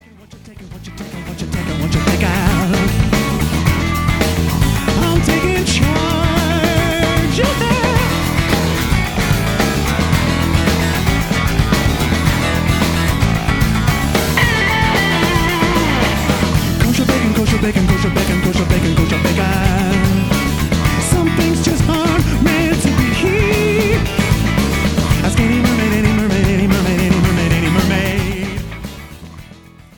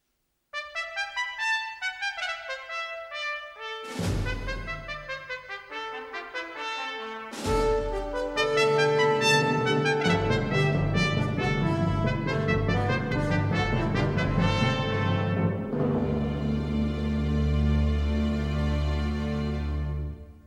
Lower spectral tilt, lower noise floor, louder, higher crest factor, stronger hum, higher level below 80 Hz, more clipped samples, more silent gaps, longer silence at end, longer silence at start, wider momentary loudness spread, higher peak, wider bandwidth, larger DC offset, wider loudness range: about the same, -5.5 dB/octave vs -6 dB/octave; second, -39 dBFS vs -76 dBFS; first, -15 LUFS vs -27 LUFS; about the same, 14 dB vs 16 dB; neither; first, -24 dBFS vs -36 dBFS; neither; neither; first, 0.45 s vs 0.05 s; second, 0.3 s vs 0.55 s; second, 3 LU vs 12 LU; first, 0 dBFS vs -10 dBFS; first, 19.5 kHz vs 13 kHz; neither; second, 1 LU vs 9 LU